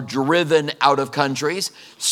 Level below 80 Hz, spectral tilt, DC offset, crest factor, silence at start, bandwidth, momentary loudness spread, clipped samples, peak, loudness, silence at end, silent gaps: -76 dBFS; -3.5 dB/octave; under 0.1%; 20 dB; 0 s; 17.5 kHz; 7 LU; under 0.1%; 0 dBFS; -19 LUFS; 0 s; none